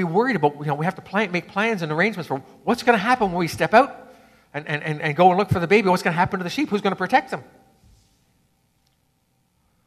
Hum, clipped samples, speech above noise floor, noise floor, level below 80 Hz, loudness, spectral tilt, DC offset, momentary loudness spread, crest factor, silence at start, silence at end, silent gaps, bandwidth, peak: none; under 0.1%; 46 dB; -67 dBFS; -56 dBFS; -21 LUFS; -6 dB/octave; under 0.1%; 11 LU; 20 dB; 0 s; 2.45 s; none; 14 kHz; -2 dBFS